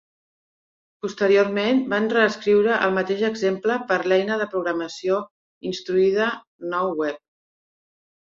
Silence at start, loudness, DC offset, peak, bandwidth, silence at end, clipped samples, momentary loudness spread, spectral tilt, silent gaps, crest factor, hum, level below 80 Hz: 1.05 s; -22 LUFS; under 0.1%; -4 dBFS; 7.6 kHz; 1.1 s; under 0.1%; 12 LU; -5.5 dB/octave; 5.31-5.61 s, 6.47-6.59 s; 18 dB; none; -66 dBFS